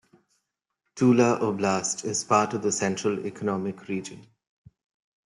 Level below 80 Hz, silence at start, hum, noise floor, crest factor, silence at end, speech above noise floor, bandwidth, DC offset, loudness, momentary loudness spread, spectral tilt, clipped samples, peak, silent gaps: -70 dBFS; 0.95 s; none; -81 dBFS; 22 dB; 1.05 s; 56 dB; 11.5 kHz; under 0.1%; -25 LUFS; 12 LU; -4.5 dB/octave; under 0.1%; -6 dBFS; none